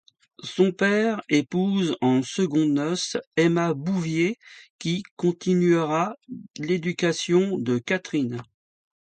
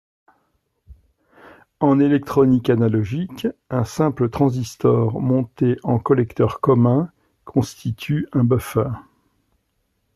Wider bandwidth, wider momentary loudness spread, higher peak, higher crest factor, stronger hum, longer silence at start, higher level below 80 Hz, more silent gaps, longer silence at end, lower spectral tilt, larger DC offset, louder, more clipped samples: second, 9.2 kHz vs 13.5 kHz; about the same, 9 LU vs 9 LU; second, -8 dBFS vs -4 dBFS; about the same, 16 dB vs 16 dB; neither; second, 0.45 s vs 0.9 s; second, -68 dBFS vs -52 dBFS; first, 3.27-3.31 s, 4.70-4.79 s, 5.11-5.17 s vs none; second, 0.65 s vs 1.15 s; second, -5.5 dB/octave vs -8 dB/octave; neither; second, -24 LUFS vs -20 LUFS; neither